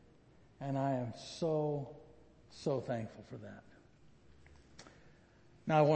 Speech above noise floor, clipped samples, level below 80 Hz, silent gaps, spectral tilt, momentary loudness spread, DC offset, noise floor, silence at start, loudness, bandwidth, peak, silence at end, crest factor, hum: 28 dB; under 0.1%; -70 dBFS; none; -7 dB/octave; 23 LU; under 0.1%; -64 dBFS; 0.6 s; -38 LUFS; 8.4 kHz; -16 dBFS; 0 s; 22 dB; none